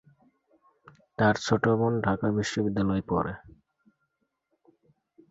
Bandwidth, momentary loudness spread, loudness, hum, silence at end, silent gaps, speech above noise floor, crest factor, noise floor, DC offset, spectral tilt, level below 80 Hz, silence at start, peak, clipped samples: 8 kHz; 8 LU; -27 LUFS; none; 1.8 s; none; 52 dB; 20 dB; -78 dBFS; under 0.1%; -6 dB/octave; -54 dBFS; 1.2 s; -10 dBFS; under 0.1%